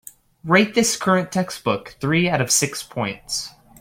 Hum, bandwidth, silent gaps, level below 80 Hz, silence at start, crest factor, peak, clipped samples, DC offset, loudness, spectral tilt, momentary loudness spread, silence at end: none; 16.5 kHz; none; -54 dBFS; 0.45 s; 20 dB; -2 dBFS; under 0.1%; under 0.1%; -20 LUFS; -3.5 dB/octave; 10 LU; 0.3 s